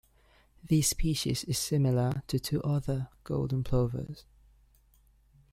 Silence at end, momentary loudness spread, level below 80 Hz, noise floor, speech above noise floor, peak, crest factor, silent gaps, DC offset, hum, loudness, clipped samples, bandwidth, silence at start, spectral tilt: 1.3 s; 9 LU; -46 dBFS; -64 dBFS; 34 dB; -14 dBFS; 18 dB; none; under 0.1%; none; -30 LUFS; under 0.1%; 16 kHz; 0.65 s; -5.5 dB/octave